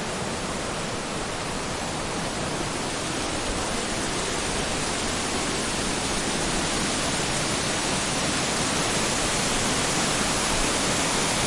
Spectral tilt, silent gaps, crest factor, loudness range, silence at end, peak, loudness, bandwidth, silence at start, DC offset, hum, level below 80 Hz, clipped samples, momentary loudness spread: -2.5 dB/octave; none; 16 dB; 5 LU; 0 s; -10 dBFS; -25 LUFS; 11.5 kHz; 0 s; under 0.1%; none; -40 dBFS; under 0.1%; 6 LU